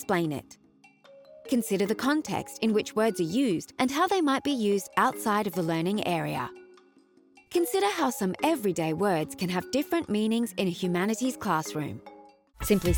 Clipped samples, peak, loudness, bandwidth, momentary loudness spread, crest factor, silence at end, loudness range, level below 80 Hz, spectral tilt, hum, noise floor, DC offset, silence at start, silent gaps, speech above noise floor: under 0.1%; -10 dBFS; -28 LUFS; over 20 kHz; 7 LU; 18 dB; 0 s; 3 LU; -52 dBFS; -5 dB/octave; none; -60 dBFS; under 0.1%; 0 s; none; 33 dB